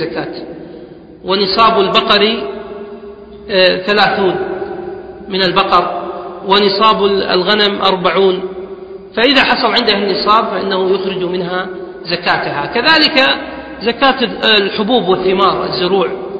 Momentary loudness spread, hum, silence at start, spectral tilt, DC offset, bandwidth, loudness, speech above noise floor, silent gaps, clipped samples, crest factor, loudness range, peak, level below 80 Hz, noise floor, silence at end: 18 LU; none; 0 s; -5.5 dB/octave; under 0.1%; 7.8 kHz; -12 LUFS; 21 dB; none; under 0.1%; 14 dB; 3 LU; 0 dBFS; -46 dBFS; -33 dBFS; 0 s